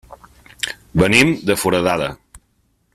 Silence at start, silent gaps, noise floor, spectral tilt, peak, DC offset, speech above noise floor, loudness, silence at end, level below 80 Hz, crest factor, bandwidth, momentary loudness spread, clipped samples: 0.1 s; none; -63 dBFS; -4.5 dB/octave; 0 dBFS; under 0.1%; 47 dB; -17 LUFS; 0.55 s; -42 dBFS; 20 dB; 15.5 kHz; 14 LU; under 0.1%